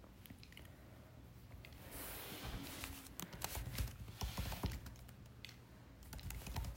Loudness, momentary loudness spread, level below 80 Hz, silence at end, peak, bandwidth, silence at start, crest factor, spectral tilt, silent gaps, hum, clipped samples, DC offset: -49 LUFS; 15 LU; -54 dBFS; 0 s; -24 dBFS; 16 kHz; 0 s; 24 dB; -4 dB/octave; none; none; under 0.1%; under 0.1%